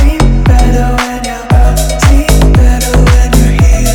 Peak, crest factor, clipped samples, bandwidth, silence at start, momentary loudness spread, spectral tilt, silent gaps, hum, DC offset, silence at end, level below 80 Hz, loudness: 0 dBFS; 6 dB; 5%; 17 kHz; 0 s; 4 LU; -5.5 dB/octave; none; none; under 0.1%; 0 s; -8 dBFS; -9 LUFS